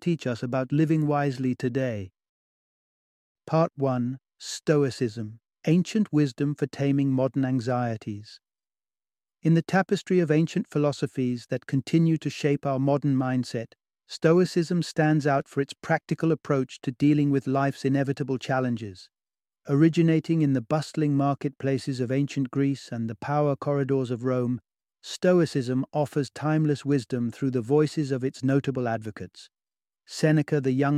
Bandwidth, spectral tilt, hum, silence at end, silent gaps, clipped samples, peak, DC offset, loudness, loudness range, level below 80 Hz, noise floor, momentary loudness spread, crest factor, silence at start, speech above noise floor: 12 kHz; -7 dB/octave; none; 0 s; 2.29-3.35 s; under 0.1%; -6 dBFS; under 0.1%; -26 LUFS; 3 LU; -68 dBFS; under -90 dBFS; 10 LU; 18 dB; 0 s; over 65 dB